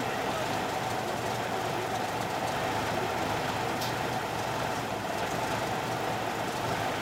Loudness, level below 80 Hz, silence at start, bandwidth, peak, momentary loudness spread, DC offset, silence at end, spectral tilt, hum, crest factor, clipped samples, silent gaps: -31 LUFS; -56 dBFS; 0 s; 16 kHz; -18 dBFS; 2 LU; under 0.1%; 0 s; -4 dB/octave; none; 14 dB; under 0.1%; none